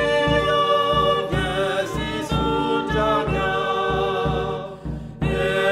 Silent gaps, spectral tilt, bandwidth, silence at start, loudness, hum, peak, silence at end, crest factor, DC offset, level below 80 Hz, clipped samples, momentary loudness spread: none; -5.5 dB/octave; 14.5 kHz; 0 s; -21 LUFS; none; -6 dBFS; 0 s; 14 dB; 0.1%; -36 dBFS; under 0.1%; 8 LU